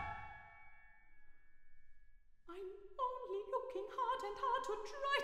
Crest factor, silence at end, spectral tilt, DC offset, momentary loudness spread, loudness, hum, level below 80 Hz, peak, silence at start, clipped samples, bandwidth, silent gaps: 20 dB; 0 s; -3.5 dB/octave; under 0.1%; 17 LU; -43 LUFS; none; -66 dBFS; -24 dBFS; 0 s; under 0.1%; 15 kHz; none